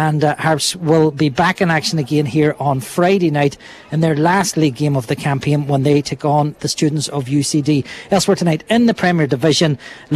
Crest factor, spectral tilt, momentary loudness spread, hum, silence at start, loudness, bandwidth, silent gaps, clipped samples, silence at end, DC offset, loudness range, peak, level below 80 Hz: 14 dB; -5.5 dB/octave; 5 LU; none; 0 s; -16 LUFS; 14 kHz; none; under 0.1%; 0 s; under 0.1%; 1 LU; 0 dBFS; -50 dBFS